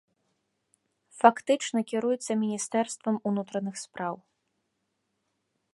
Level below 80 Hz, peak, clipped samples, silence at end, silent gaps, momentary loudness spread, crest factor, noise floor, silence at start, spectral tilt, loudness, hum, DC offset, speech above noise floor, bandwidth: -82 dBFS; -4 dBFS; under 0.1%; 1.6 s; none; 13 LU; 26 dB; -79 dBFS; 1.15 s; -4.5 dB/octave; -28 LUFS; none; under 0.1%; 51 dB; 11.5 kHz